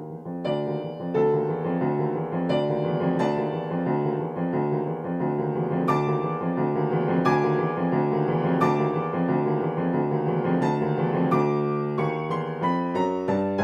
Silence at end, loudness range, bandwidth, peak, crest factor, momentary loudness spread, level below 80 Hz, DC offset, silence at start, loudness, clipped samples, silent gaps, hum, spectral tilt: 0 s; 2 LU; 8.2 kHz; -8 dBFS; 16 dB; 5 LU; -62 dBFS; under 0.1%; 0 s; -25 LUFS; under 0.1%; none; none; -9 dB/octave